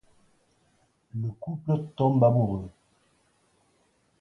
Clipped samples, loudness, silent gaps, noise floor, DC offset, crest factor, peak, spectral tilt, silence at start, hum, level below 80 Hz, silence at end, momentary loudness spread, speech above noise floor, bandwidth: under 0.1%; -26 LUFS; none; -68 dBFS; under 0.1%; 20 dB; -8 dBFS; -11 dB/octave; 1.15 s; none; -58 dBFS; 1.5 s; 15 LU; 43 dB; 5.8 kHz